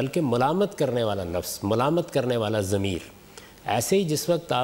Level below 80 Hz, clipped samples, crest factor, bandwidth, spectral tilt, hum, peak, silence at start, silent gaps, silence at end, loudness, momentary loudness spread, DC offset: -54 dBFS; under 0.1%; 14 dB; 16 kHz; -5 dB/octave; none; -10 dBFS; 0 s; none; 0 s; -25 LUFS; 7 LU; under 0.1%